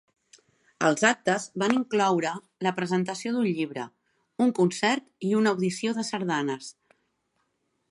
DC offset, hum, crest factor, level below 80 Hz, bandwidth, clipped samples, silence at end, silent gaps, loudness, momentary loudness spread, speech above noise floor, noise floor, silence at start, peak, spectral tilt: under 0.1%; none; 22 dB; -76 dBFS; 11.5 kHz; under 0.1%; 1.2 s; none; -26 LUFS; 10 LU; 49 dB; -75 dBFS; 0.8 s; -4 dBFS; -4.5 dB/octave